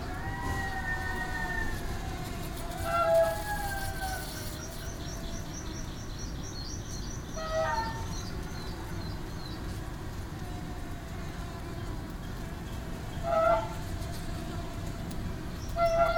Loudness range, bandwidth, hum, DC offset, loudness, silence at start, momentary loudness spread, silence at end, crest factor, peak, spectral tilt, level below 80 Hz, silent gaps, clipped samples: 8 LU; over 20 kHz; none; under 0.1%; -34 LUFS; 0 s; 12 LU; 0 s; 18 dB; -14 dBFS; -5 dB/octave; -40 dBFS; none; under 0.1%